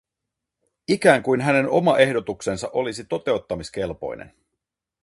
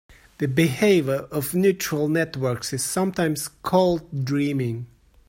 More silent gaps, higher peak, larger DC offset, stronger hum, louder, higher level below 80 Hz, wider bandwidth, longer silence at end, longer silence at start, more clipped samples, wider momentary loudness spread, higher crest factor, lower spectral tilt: neither; first, -2 dBFS vs -6 dBFS; neither; neither; about the same, -21 LUFS vs -23 LUFS; about the same, -54 dBFS vs -54 dBFS; second, 11.5 kHz vs 16.5 kHz; first, 0.8 s vs 0.4 s; first, 0.9 s vs 0.4 s; neither; first, 14 LU vs 8 LU; about the same, 22 dB vs 18 dB; about the same, -5.5 dB/octave vs -5.5 dB/octave